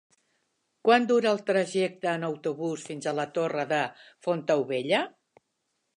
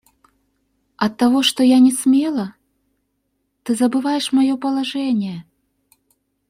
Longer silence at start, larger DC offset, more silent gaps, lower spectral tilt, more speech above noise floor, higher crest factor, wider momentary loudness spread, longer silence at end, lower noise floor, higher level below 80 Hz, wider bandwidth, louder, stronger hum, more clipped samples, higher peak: second, 0.85 s vs 1 s; neither; neither; about the same, -5 dB/octave vs -4 dB/octave; about the same, 52 dB vs 54 dB; first, 22 dB vs 16 dB; second, 10 LU vs 13 LU; second, 0.85 s vs 1.1 s; first, -78 dBFS vs -71 dBFS; second, -82 dBFS vs -62 dBFS; second, 11 kHz vs 16 kHz; second, -27 LUFS vs -17 LUFS; neither; neither; second, -8 dBFS vs -4 dBFS